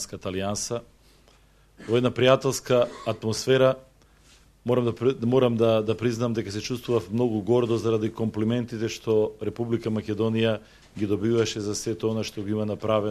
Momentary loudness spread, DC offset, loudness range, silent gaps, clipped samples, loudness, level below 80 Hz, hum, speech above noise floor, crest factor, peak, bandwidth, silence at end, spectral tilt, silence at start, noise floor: 9 LU; under 0.1%; 3 LU; none; under 0.1%; -25 LUFS; -56 dBFS; none; 33 dB; 22 dB; -4 dBFS; 14 kHz; 0 s; -5.5 dB/octave; 0 s; -57 dBFS